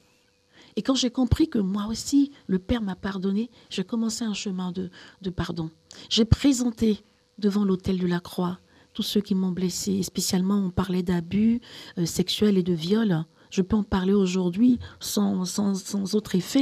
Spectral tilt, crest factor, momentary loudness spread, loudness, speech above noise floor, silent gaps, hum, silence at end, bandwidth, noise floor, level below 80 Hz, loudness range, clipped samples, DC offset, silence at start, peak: -5.5 dB/octave; 22 dB; 9 LU; -25 LUFS; 39 dB; none; none; 0 s; 14.5 kHz; -63 dBFS; -44 dBFS; 4 LU; under 0.1%; under 0.1%; 0.75 s; -2 dBFS